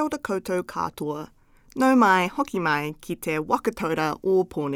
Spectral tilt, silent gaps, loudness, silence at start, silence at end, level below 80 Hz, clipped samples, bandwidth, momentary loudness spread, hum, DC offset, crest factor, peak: -5.5 dB/octave; none; -24 LUFS; 0 s; 0 s; -56 dBFS; under 0.1%; 17 kHz; 13 LU; none; under 0.1%; 18 dB; -6 dBFS